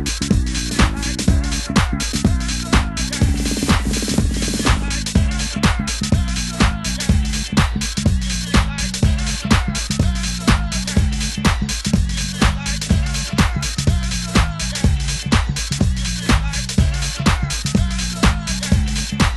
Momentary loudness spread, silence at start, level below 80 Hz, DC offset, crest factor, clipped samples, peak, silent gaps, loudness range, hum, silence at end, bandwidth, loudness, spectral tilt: 3 LU; 0 s; -22 dBFS; under 0.1%; 18 dB; under 0.1%; 0 dBFS; none; 1 LU; none; 0 s; 12.5 kHz; -19 LUFS; -4 dB/octave